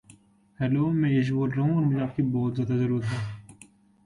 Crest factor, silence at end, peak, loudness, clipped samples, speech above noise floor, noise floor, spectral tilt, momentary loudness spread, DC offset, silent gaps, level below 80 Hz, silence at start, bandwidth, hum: 14 dB; 0.55 s; -14 dBFS; -26 LUFS; under 0.1%; 32 dB; -56 dBFS; -8.5 dB/octave; 8 LU; under 0.1%; none; -58 dBFS; 0.6 s; 11.5 kHz; none